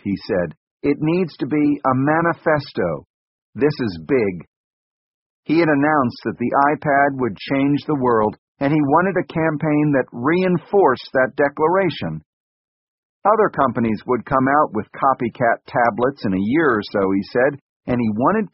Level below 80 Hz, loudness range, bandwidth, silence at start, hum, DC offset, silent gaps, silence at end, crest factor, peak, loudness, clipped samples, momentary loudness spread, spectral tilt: -52 dBFS; 3 LU; 5.8 kHz; 0.05 s; none; under 0.1%; 0.57-0.77 s, 3.10-3.53 s, 4.48-5.43 s, 8.39-8.55 s, 12.26-13.22 s, 17.61-17.80 s; 0.05 s; 16 dB; -2 dBFS; -19 LUFS; under 0.1%; 8 LU; -6 dB/octave